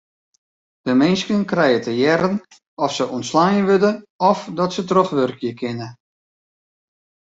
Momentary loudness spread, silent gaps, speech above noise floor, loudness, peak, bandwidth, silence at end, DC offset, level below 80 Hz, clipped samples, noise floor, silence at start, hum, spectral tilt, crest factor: 11 LU; 2.67-2.77 s, 4.10-4.19 s; over 72 dB; -19 LUFS; -2 dBFS; 7.8 kHz; 1.35 s; under 0.1%; -60 dBFS; under 0.1%; under -90 dBFS; 0.85 s; none; -5.5 dB/octave; 18 dB